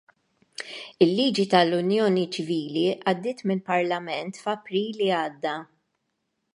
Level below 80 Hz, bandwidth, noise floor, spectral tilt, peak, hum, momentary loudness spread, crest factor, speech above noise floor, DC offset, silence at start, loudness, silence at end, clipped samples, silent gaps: -72 dBFS; 11.5 kHz; -77 dBFS; -5.5 dB/octave; -4 dBFS; none; 14 LU; 22 dB; 53 dB; under 0.1%; 0.6 s; -25 LUFS; 0.9 s; under 0.1%; none